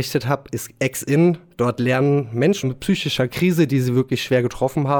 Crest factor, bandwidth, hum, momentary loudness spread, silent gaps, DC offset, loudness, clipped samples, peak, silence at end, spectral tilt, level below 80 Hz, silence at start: 14 dB; over 20 kHz; none; 6 LU; none; under 0.1%; -20 LUFS; under 0.1%; -6 dBFS; 0 s; -6 dB/octave; -50 dBFS; 0 s